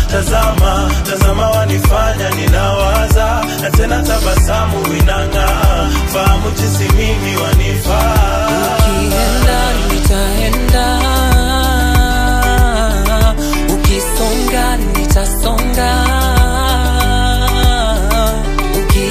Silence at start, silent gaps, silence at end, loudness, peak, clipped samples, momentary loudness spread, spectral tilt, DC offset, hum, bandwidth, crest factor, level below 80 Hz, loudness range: 0 s; none; 0 s; -13 LUFS; 0 dBFS; under 0.1%; 3 LU; -4.5 dB/octave; under 0.1%; none; 15.5 kHz; 12 dB; -14 dBFS; 1 LU